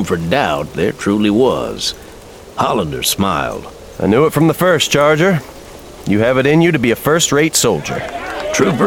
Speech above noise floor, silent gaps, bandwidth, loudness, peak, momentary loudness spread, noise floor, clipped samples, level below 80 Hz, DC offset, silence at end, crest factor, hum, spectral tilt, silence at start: 21 dB; none; 19.5 kHz; -14 LUFS; 0 dBFS; 12 LU; -35 dBFS; under 0.1%; -40 dBFS; 0.1%; 0 s; 14 dB; none; -4.5 dB/octave; 0 s